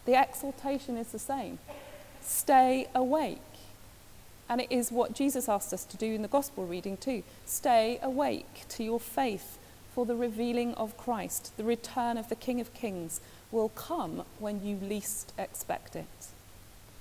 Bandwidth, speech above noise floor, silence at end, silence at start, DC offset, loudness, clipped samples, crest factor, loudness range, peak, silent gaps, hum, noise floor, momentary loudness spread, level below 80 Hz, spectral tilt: 16 kHz; 21 dB; 0 s; 0 s; under 0.1%; -32 LUFS; under 0.1%; 18 dB; 6 LU; -14 dBFS; none; none; -52 dBFS; 17 LU; -60 dBFS; -4 dB/octave